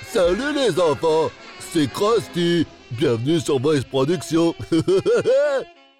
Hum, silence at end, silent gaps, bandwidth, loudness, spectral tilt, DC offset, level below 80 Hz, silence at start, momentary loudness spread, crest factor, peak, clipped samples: none; 0.35 s; none; 15.5 kHz; -20 LUFS; -5.5 dB/octave; under 0.1%; -50 dBFS; 0 s; 5 LU; 10 dB; -10 dBFS; under 0.1%